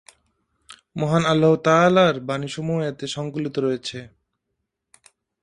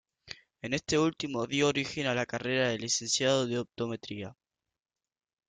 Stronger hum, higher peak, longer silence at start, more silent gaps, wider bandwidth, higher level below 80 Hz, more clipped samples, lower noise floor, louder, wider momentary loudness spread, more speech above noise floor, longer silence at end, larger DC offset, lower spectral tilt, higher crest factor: neither; first, -4 dBFS vs -14 dBFS; first, 0.7 s vs 0.25 s; neither; first, 11 kHz vs 9.6 kHz; first, -60 dBFS vs -66 dBFS; neither; second, -78 dBFS vs -90 dBFS; first, -21 LUFS vs -30 LUFS; about the same, 13 LU vs 15 LU; about the same, 58 dB vs 59 dB; first, 1.35 s vs 1.15 s; neither; first, -6 dB/octave vs -3.5 dB/octave; about the same, 18 dB vs 20 dB